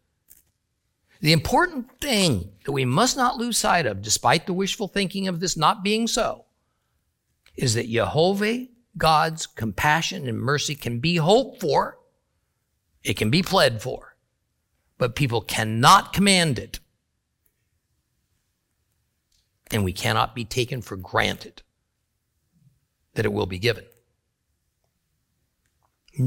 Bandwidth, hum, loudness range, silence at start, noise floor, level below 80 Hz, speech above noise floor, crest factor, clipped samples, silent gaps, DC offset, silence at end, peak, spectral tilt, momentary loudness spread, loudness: 17 kHz; none; 9 LU; 1.2 s; -75 dBFS; -50 dBFS; 53 dB; 24 dB; under 0.1%; none; under 0.1%; 0 s; 0 dBFS; -4 dB/octave; 12 LU; -22 LUFS